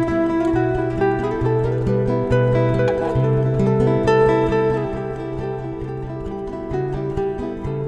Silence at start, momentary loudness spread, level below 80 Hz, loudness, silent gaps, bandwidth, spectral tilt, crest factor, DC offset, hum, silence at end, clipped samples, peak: 0 s; 11 LU; -36 dBFS; -20 LUFS; none; 8.6 kHz; -9 dB/octave; 14 dB; under 0.1%; none; 0 s; under 0.1%; -6 dBFS